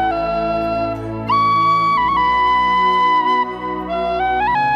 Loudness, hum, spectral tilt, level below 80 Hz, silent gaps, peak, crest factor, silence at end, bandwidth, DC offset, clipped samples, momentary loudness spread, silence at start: -16 LUFS; none; -6 dB/octave; -40 dBFS; none; -6 dBFS; 10 dB; 0 s; 10.5 kHz; under 0.1%; under 0.1%; 8 LU; 0 s